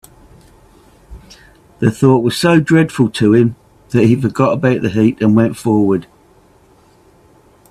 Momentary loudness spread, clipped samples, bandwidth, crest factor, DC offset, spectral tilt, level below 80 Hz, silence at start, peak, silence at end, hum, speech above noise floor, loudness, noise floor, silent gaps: 6 LU; under 0.1%; 13.5 kHz; 14 dB; under 0.1%; -7 dB/octave; -46 dBFS; 1.1 s; 0 dBFS; 1.65 s; none; 36 dB; -13 LUFS; -49 dBFS; none